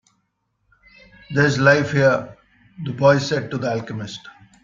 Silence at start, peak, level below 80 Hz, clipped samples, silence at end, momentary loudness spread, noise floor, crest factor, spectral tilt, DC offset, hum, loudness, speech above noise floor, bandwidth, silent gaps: 1.3 s; -2 dBFS; -56 dBFS; under 0.1%; 0.35 s; 17 LU; -71 dBFS; 18 dB; -6 dB/octave; under 0.1%; none; -18 LUFS; 52 dB; 7.6 kHz; none